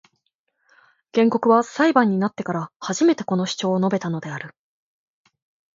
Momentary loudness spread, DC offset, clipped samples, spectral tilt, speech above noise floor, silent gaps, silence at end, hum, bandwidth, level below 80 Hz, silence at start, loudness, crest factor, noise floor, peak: 11 LU; under 0.1%; under 0.1%; -5.5 dB/octave; 53 dB; 2.76-2.80 s; 1.25 s; none; 7.8 kHz; -70 dBFS; 1.15 s; -21 LUFS; 20 dB; -73 dBFS; -2 dBFS